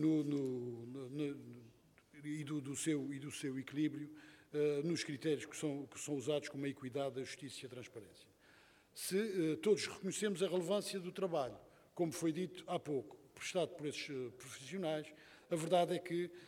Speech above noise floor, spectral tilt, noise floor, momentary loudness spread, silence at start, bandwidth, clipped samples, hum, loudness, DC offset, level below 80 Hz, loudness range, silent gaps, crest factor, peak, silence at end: 27 dB; -5 dB/octave; -67 dBFS; 15 LU; 0 s; 17 kHz; under 0.1%; none; -41 LUFS; under 0.1%; -82 dBFS; 5 LU; none; 20 dB; -22 dBFS; 0 s